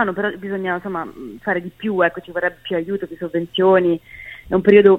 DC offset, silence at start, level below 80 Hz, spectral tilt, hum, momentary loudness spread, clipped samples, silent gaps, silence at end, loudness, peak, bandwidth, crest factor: under 0.1%; 0 s; -50 dBFS; -8 dB/octave; none; 13 LU; under 0.1%; none; 0 s; -20 LUFS; 0 dBFS; 4 kHz; 18 dB